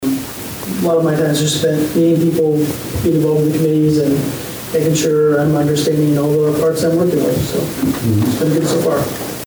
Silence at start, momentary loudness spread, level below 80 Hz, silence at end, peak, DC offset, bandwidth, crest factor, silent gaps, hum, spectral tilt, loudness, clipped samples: 0 s; 6 LU; -42 dBFS; 0 s; -6 dBFS; under 0.1%; over 20 kHz; 8 dB; none; none; -6 dB/octave; -15 LUFS; under 0.1%